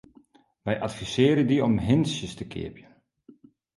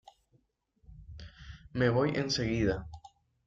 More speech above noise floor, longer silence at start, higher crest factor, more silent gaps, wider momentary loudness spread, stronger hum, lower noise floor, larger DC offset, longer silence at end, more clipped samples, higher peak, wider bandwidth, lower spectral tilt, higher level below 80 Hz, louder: second, 34 dB vs 42 dB; second, 0.65 s vs 0.9 s; about the same, 18 dB vs 20 dB; neither; second, 15 LU vs 23 LU; neither; second, -58 dBFS vs -72 dBFS; neither; first, 1 s vs 0.4 s; neither; first, -8 dBFS vs -14 dBFS; first, 11.5 kHz vs 7.8 kHz; about the same, -6.5 dB/octave vs -5.5 dB/octave; about the same, -52 dBFS vs -52 dBFS; first, -25 LUFS vs -31 LUFS